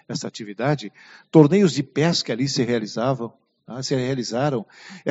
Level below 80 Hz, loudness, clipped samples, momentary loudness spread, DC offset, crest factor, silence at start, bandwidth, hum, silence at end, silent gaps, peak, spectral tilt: -62 dBFS; -21 LUFS; under 0.1%; 16 LU; under 0.1%; 22 dB; 0.1 s; 8 kHz; none; 0 s; none; 0 dBFS; -5.5 dB/octave